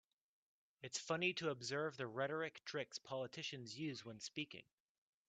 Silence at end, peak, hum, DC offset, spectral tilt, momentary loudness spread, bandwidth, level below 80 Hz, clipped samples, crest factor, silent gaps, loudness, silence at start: 0.65 s; -26 dBFS; none; under 0.1%; -3.5 dB/octave; 9 LU; 9 kHz; -86 dBFS; under 0.1%; 22 dB; none; -45 LUFS; 0.8 s